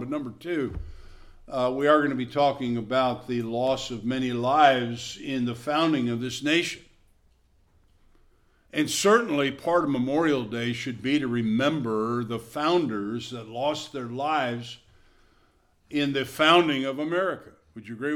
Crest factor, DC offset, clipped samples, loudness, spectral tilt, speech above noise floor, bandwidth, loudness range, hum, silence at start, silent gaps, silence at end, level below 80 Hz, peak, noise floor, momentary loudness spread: 22 dB; under 0.1%; under 0.1%; -25 LUFS; -4.5 dB/octave; 38 dB; 17 kHz; 5 LU; none; 0 s; none; 0 s; -54 dBFS; -4 dBFS; -63 dBFS; 13 LU